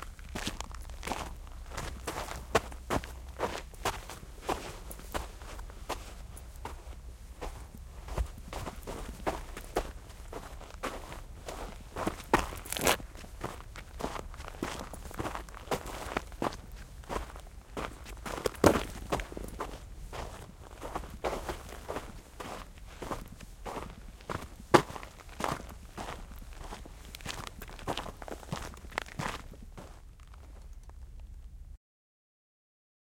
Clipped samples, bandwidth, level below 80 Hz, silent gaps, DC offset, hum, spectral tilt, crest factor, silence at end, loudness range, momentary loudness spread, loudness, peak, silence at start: under 0.1%; 17 kHz; -46 dBFS; none; under 0.1%; none; -4 dB/octave; 36 dB; 1.4 s; 9 LU; 17 LU; -37 LUFS; -2 dBFS; 0 s